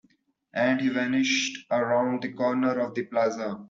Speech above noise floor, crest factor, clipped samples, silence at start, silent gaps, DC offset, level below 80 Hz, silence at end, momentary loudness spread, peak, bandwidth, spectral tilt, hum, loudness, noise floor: 40 dB; 16 dB; under 0.1%; 0.55 s; none; under 0.1%; -72 dBFS; 0 s; 5 LU; -12 dBFS; 7.6 kHz; -4 dB/octave; none; -26 LUFS; -66 dBFS